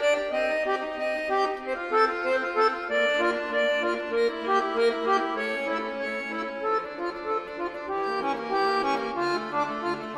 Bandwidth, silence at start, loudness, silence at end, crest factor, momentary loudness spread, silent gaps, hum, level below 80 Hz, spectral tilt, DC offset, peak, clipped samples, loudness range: 12.5 kHz; 0 s; -27 LUFS; 0 s; 16 dB; 7 LU; none; none; -60 dBFS; -3.5 dB/octave; under 0.1%; -10 dBFS; under 0.1%; 4 LU